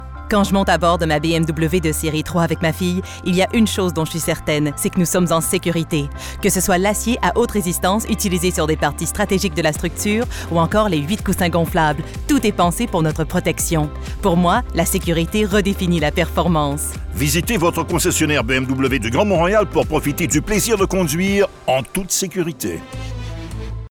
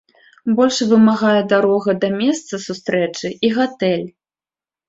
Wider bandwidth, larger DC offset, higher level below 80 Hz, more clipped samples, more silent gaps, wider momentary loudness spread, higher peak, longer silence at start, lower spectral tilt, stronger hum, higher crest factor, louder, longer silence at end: first, 19.5 kHz vs 7.8 kHz; first, 0.2% vs under 0.1%; first, -32 dBFS vs -62 dBFS; neither; neither; second, 6 LU vs 11 LU; about the same, -4 dBFS vs -2 dBFS; second, 0 s vs 0.45 s; about the same, -4.5 dB/octave vs -5 dB/octave; neither; about the same, 14 dB vs 16 dB; about the same, -18 LUFS vs -17 LUFS; second, 0 s vs 0.8 s